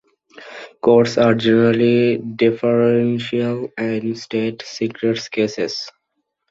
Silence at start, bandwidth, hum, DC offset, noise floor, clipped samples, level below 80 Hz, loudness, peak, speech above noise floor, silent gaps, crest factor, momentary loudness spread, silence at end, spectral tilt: 0.35 s; 7.8 kHz; none; under 0.1%; -74 dBFS; under 0.1%; -58 dBFS; -18 LUFS; -2 dBFS; 57 dB; none; 16 dB; 11 LU; 0.6 s; -6.5 dB/octave